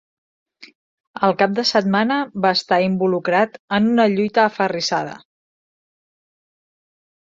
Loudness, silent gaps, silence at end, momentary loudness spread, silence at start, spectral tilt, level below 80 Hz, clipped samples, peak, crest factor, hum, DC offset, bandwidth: -18 LUFS; 0.75-1.14 s, 3.59-3.68 s; 2.2 s; 5 LU; 0.6 s; -5 dB/octave; -64 dBFS; under 0.1%; -2 dBFS; 18 dB; none; under 0.1%; 7.8 kHz